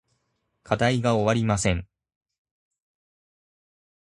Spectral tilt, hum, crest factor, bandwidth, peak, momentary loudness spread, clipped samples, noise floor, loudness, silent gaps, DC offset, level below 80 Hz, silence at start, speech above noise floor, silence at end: -5.5 dB/octave; none; 22 dB; 11.5 kHz; -4 dBFS; 6 LU; under 0.1%; -75 dBFS; -24 LUFS; none; under 0.1%; -46 dBFS; 0.7 s; 52 dB; 2.35 s